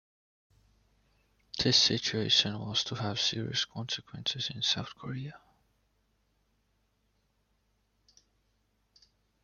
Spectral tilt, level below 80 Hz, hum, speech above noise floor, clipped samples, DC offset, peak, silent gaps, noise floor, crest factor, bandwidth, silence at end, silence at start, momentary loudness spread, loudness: -3 dB/octave; -66 dBFS; none; 43 dB; under 0.1%; under 0.1%; -10 dBFS; none; -75 dBFS; 26 dB; 12 kHz; 4.05 s; 1.55 s; 16 LU; -29 LUFS